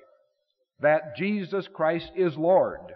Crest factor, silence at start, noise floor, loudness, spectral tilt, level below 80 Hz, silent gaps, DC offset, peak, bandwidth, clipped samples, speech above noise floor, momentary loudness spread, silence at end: 16 dB; 0.8 s; -76 dBFS; -25 LUFS; -5 dB/octave; -64 dBFS; none; under 0.1%; -10 dBFS; 5.8 kHz; under 0.1%; 51 dB; 7 LU; 0 s